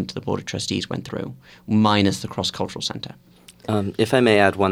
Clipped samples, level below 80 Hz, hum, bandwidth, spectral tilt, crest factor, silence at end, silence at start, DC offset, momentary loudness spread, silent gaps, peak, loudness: under 0.1%; -56 dBFS; none; 16 kHz; -5 dB/octave; 22 dB; 0 s; 0 s; under 0.1%; 17 LU; none; 0 dBFS; -21 LUFS